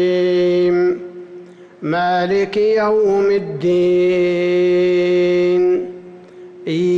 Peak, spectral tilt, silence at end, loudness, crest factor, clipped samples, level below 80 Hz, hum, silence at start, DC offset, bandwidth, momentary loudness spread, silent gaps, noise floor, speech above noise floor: -8 dBFS; -7 dB/octave; 0 s; -16 LUFS; 6 dB; under 0.1%; -58 dBFS; none; 0 s; under 0.1%; 7.2 kHz; 14 LU; none; -38 dBFS; 23 dB